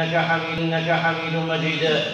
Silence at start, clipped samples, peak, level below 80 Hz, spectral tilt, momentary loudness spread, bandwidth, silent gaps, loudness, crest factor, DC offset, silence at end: 0 s; under 0.1%; -8 dBFS; -58 dBFS; -5.5 dB/octave; 3 LU; 7.4 kHz; none; -22 LUFS; 14 dB; under 0.1%; 0 s